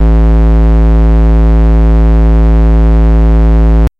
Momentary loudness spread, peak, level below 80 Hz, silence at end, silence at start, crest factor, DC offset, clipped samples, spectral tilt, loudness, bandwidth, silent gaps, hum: 0 LU; -4 dBFS; -6 dBFS; 0.1 s; 0 s; 2 dB; under 0.1%; under 0.1%; -10 dB/octave; -9 LUFS; 3.4 kHz; none; none